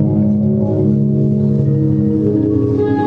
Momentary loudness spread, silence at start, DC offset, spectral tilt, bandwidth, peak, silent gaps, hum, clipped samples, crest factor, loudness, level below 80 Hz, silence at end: 1 LU; 0 s; under 0.1%; -12 dB/octave; 4 kHz; -4 dBFS; none; none; under 0.1%; 10 dB; -14 LUFS; -42 dBFS; 0 s